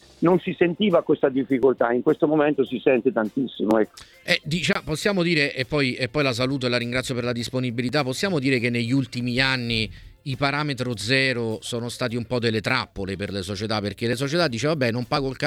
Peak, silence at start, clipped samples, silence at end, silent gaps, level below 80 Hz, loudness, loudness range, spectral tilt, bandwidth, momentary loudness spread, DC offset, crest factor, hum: -4 dBFS; 0.2 s; under 0.1%; 0 s; none; -52 dBFS; -23 LUFS; 3 LU; -5.5 dB/octave; 16 kHz; 7 LU; under 0.1%; 20 dB; none